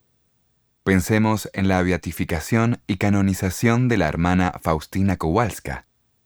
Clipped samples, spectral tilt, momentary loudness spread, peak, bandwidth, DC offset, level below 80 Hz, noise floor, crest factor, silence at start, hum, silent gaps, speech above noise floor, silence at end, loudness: under 0.1%; -6.5 dB/octave; 7 LU; -2 dBFS; over 20 kHz; 0.2%; -42 dBFS; -66 dBFS; 18 dB; 0.85 s; none; none; 46 dB; 0.45 s; -21 LUFS